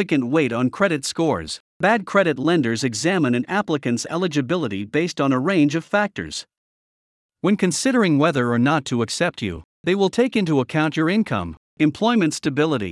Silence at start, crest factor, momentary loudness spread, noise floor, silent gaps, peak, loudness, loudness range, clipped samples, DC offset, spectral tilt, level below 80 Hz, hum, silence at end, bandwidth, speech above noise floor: 0 s; 16 dB; 7 LU; under -90 dBFS; 1.60-1.80 s, 6.57-7.29 s, 9.64-9.84 s, 11.57-11.77 s; -4 dBFS; -20 LUFS; 2 LU; under 0.1%; under 0.1%; -5 dB/octave; -58 dBFS; none; 0 s; 12 kHz; over 70 dB